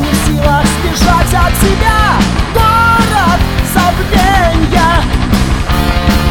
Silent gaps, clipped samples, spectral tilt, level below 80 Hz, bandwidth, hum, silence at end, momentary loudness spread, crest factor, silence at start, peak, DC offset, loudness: none; under 0.1%; -5 dB/octave; -14 dBFS; 18.5 kHz; none; 0 s; 4 LU; 10 dB; 0 s; 0 dBFS; 0.5%; -10 LUFS